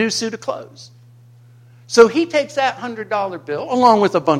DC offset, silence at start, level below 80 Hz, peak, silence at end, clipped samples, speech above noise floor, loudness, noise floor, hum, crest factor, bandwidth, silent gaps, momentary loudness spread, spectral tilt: under 0.1%; 0 s; -60 dBFS; 0 dBFS; 0 s; under 0.1%; 29 dB; -17 LUFS; -46 dBFS; none; 18 dB; 13.5 kHz; none; 14 LU; -4 dB/octave